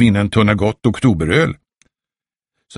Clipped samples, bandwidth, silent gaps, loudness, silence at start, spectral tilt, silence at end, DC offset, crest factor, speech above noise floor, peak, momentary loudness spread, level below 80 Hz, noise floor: under 0.1%; 11.5 kHz; none; -15 LUFS; 0 s; -7 dB/octave; 0 s; under 0.1%; 16 dB; over 76 dB; 0 dBFS; 5 LU; -38 dBFS; under -90 dBFS